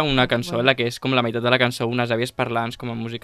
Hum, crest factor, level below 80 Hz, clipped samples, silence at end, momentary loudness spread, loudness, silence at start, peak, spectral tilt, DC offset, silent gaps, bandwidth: none; 22 dB; -46 dBFS; under 0.1%; 0.05 s; 7 LU; -21 LUFS; 0 s; 0 dBFS; -5.5 dB/octave; under 0.1%; none; 14 kHz